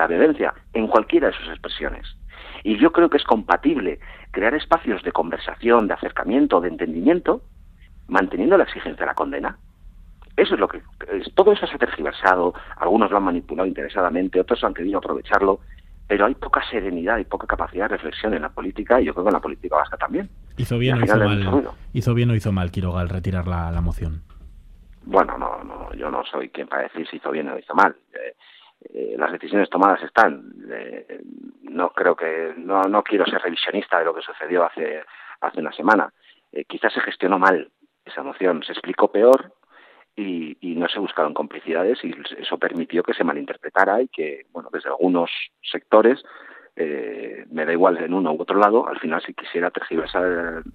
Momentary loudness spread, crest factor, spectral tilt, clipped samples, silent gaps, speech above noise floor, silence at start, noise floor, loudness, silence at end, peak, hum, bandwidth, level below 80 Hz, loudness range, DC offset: 14 LU; 22 dB; -7.5 dB/octave; under 0.1%; none; 31 dB; 0 s; -52 dBFS; -21 LUFS; 0.05 s; 0 dBFS; none; 13 kHz; -42 dBFS; 4 LU; under 0.1%